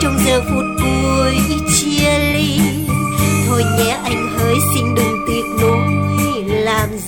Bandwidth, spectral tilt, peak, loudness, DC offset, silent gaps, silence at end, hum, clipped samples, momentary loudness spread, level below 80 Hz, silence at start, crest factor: 18 kHz; -4.5 dB/octave; -2 dBFS; -15 LUFS; 0.3%; none; 0 s; none; under 0.1%; 4 LU; -30 dBFS; 0 s; 14 dB